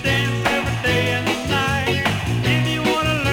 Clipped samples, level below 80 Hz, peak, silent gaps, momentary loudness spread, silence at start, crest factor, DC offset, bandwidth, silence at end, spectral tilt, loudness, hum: under 0.1%; -36 dBFS; -6 dBFS; none; 2 LU; 0 s; 12 dB; under 0.1%; 18 kHz; 0 s; -5 dB/octave; -19 LUFS; none